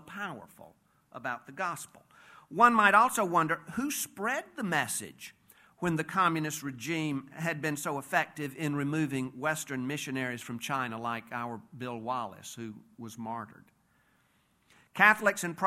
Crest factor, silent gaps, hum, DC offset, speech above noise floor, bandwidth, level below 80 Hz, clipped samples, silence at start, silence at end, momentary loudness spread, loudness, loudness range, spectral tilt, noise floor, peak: 26 dB; none; none; under 0.1%; 39 dB; 16 kHz; -72 dBFS; under 0.1%; 0.05 s; 0 s; 19 LU; -30 LUFS; 11 LU; -4 dB/octave; -70 dBFS; -6 dBFS